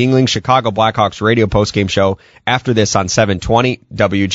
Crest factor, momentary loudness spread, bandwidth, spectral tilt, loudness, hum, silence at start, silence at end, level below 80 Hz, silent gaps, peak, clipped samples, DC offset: 14 dB; 4 LU; 8 kHz; -5 dB/octave; -14 LUFS; none; 0 s; 0 s; -36 dBFS; none; 0 dBFS; under 0.1%; under 0.1%